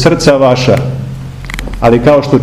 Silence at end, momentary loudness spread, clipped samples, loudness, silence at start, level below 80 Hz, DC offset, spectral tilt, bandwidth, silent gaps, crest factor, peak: 0 s; 15 LU; 4%; -9 LUFS; 0 s; -26 dBFS; under 0.1%; -6 dB/octave; 13.5 kHz; none; 10 dB; 0 dBFS